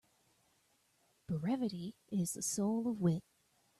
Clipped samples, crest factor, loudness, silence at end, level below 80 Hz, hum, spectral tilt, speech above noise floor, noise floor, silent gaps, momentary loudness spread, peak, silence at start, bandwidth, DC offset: under 0.1%; 18 dB; -37 LUFS; 0.6 s; -74 dBFS; none; -6 dB/octave; 39 dB; -75 dBFS; none; 7 LU; -22 dBFS; 1.3 s; 14.5 kHz; under 0.1%